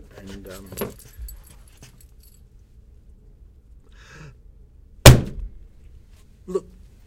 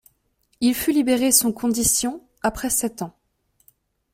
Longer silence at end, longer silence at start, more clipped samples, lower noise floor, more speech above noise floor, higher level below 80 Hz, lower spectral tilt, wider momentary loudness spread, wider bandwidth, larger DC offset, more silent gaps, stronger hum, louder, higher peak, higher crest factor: second, 0.45 s vs 1.05 s; first, 0.75 s vs 0.6 s; neither; second, -49 dBFS vs -67 dBFS; second, 14 dB vs 46 dB; first, -30 dBFS vs -48 dBFS; first, -4.5 dB/octave vs -2.5 dB/octave; first, 29 LU vs 12 LU; about the same, 17 kHz vs 16.5 kHz; neither; neither; neither; first, -17 LUFS vs -20 LUFS; about the same, 0 dBFS vs -2 dBFS; about the same, 24 dB vs 22 dB